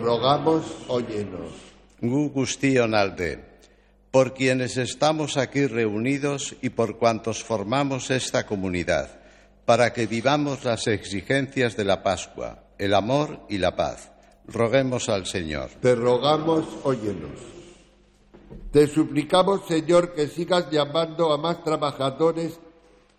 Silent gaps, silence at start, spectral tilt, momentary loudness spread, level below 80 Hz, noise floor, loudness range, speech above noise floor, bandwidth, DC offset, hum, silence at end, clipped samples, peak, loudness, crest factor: none; 0 s; -5 dB/octave; 10 LU; -50 dBFS; -57 dBFS; 3 LU; 33 dB; 13 kHz; under 0.1%; none; 0.5 s; under 0.1%; -6 dBFS; -24 LUFS; 18 dB